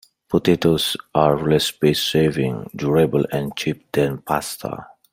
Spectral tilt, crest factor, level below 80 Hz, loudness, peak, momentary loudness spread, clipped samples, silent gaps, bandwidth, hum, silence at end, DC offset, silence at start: -5.5 dB/octave; 18 dB; -50 dBFS; -20 LUFS; -2 dBFS; 8 LU; under 0.1%; none; 16 kHz; none; 0.3 s; under 0.1%; 0.3 s